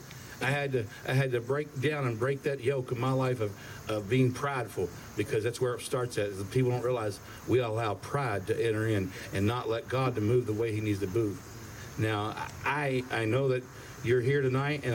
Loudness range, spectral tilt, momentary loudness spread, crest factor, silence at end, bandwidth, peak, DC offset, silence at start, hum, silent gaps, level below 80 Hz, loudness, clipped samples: 1 LU; -6.5 dB/octave; 8 LU; 16 dB; 0 s; 17 kHz; -16 dBFS; under 0.1%; 0 s; none; none; -60 dBFS; -31 LUFS; under 0.1%